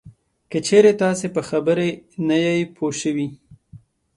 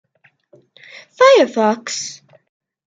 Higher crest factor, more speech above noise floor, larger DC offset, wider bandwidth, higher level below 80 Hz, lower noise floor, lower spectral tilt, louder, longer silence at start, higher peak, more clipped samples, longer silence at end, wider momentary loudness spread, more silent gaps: about the same, 18 dB vs 16 dB; second, 28 dB vs 41 dB; neither; first, 11.5 kHz vs 9.2 kHz; first, -60 dBFS vs -70 dBFS; second, -47 dBFS vs -55 dBFS; first, -5 dB/octave vs -3 dB/octave; second, -20 LUFS vs -14 LUFS; second, 0.05 s vs 1.2 s; about the same, -2 dBFS vs -2 dBFS; neither; second, 0.4 s vs 0.75 s; about the same, 12 LU vs 14 LU; neither